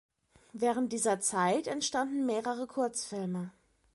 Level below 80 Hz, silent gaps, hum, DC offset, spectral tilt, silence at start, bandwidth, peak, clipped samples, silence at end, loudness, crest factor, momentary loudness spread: -74 dBFS; none; none; under 0.1%; -3.5 dB/octave; 0.55 s; 11.5 kHz; -16 dBFS; under 0.1%; 0.45 s; -32 LUFS; 16 dB; 8 LU